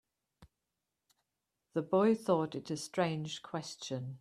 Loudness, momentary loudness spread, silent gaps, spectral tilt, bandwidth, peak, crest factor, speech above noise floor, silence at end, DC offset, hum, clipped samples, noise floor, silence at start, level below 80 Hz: -35 LUFS; 12 LU; none; -5.5 dB/octave; 14 kHz; -16 dBFS; 20 dB; 54 dB; 0.05 s; under 0.1%; none; under 0.1%; -88 dBFS; 0.4 s; -76 dBFS